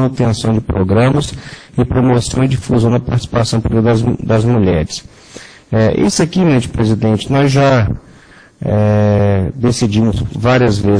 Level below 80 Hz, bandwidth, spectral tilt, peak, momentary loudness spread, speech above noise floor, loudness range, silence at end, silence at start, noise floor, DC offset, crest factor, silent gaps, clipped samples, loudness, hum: -32 dBFS; 10.5 kHz; -6.5 dB/octave; 0 dBFS; 7 LU; 29 dB; 1 LU; 0 s; 0 s; -42 dBFS; under 0.1%; 12 dB; none; under 0.1%; -13 LUFS; none